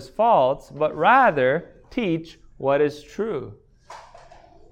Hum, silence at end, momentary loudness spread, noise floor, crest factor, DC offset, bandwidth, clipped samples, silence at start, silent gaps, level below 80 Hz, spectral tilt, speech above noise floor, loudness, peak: none; 0.7 s; 14 LU; -48 dBFS; 18 dB; under 0.1%; 10 kHz; under 0.1%; 0 s; none; -54 dBFS; -6.5 dB/octave; 27 dB; -21 LUFS; -4 dBFS